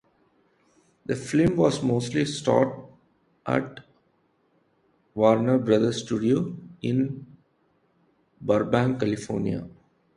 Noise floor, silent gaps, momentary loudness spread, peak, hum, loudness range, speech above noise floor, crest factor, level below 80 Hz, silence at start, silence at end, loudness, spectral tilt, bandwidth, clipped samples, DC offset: -67 dBFS; none; 16 LU; -4 dBFS; none; 3 LU; 44 dB; 22 dB; -56 dBFS; 1.1 s; 0.45 s; -25 LUFS; -6.5 dB/octave; 11.5 kHz; under 0.1%; under 0.1%